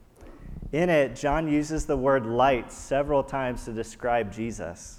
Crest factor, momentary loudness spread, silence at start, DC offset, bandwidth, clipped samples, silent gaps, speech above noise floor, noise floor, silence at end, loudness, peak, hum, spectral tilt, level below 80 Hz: 18 dB; 11 LU; 0.2 s; under 0.1%; 13 kHz; under 0.1%; none; 20 dB; -46 dBFS; 0 s; -26 LUFS; -10 dBFS; none; -6 dB/octave; -42 dBFS